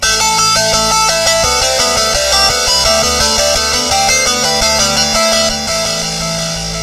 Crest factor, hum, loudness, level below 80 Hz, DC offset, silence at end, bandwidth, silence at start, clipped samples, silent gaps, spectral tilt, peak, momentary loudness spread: 12 dB; none; -10 LUFS; -30 dBFS; under 0.1%; 0 s; 14.5 kHz; 0 s; under 0.1%; none; -1 dB/octave; 0 dBFS; 5 LU